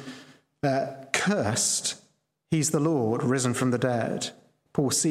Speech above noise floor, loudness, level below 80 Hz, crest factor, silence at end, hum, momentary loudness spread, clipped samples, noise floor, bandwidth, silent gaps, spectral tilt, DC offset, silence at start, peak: 41 dB; -26 LUFS; -66 dBFS; 20 dB; 0 s; none; 9 LU; under 0.1%; -66 dBFS; 16.5 kHz; none; -4 dB/octave; under 0.1%; 0 s; -6 dBFS